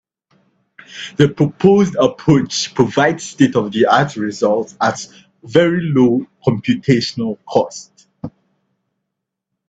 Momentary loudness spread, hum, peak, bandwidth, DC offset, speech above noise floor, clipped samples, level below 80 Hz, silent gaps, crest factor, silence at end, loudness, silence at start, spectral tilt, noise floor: 17 LU; none; 0 dBFS; 8.4 kHz; under 0.1%; 63 dB; under 0.1%; -52 dBFS; none; 16 dB; 1.4 s; -15 LUFS; 0.9 s; -6 dB/octave; -78 dBFS